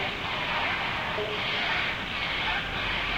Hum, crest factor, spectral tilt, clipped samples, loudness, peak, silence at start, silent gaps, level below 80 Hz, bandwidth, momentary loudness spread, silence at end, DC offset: none; 14 dB; -4 dB/octave; under 0.1%; -28 LUFS; -16 dBFS; 0 s; none; -46 dBFS; 16.5 kHz; 3 LU; 0 s; 0.1%